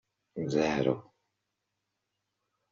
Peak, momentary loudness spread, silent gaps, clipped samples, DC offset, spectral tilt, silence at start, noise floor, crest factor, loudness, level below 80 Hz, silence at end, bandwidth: -14 dBFS; 11 LU; none; under 0.1%; under 0.1%; -5.5 dB/octave; 0.35 s; -84 dBFS; 22 dB; -31 LUFS; -66 dBFS; 1.7 s; 7.4 kHz